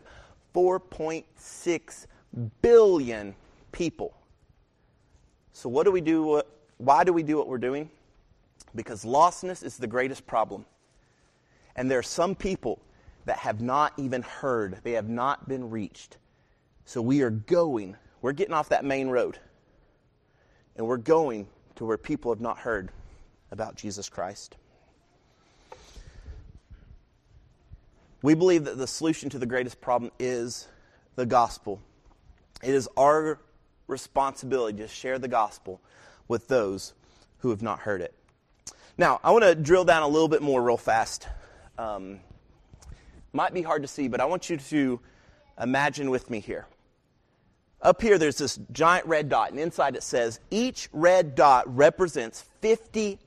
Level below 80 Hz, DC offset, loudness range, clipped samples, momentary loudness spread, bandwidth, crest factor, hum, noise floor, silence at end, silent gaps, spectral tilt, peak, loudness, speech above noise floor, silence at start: -54 dBFS; under 0.1%; 8 LU; under 0.1%; 18 LU; 13 kHz; 22 dB; none; -67 dBFS; 0.1 s; none; -5 dB/octave; -6 dBFS; -26 LUFS; 42 dB; 0.2 s